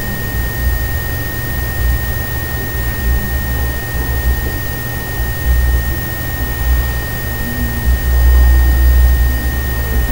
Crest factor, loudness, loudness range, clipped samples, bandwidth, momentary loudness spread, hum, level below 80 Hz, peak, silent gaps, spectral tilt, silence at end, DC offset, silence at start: 14 dB; -16 LUFS; 4 LU; under 0.1%; over 20 kHz; 7 LU; none; -16 dBFS; 0 dBFS; none; -5 dB/octave; 0 s; under 0.1%; 0 s